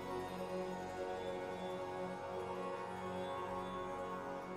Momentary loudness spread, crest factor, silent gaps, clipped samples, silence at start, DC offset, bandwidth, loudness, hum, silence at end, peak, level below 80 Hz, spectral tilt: 1 LU; 12 dB; none; under 0.1%; 0 s; under 0.1%; 15.5 kHz; -44 LUFS; none; 0 s; -32 dBFS; -68 dBFS; -5.5 dB/octave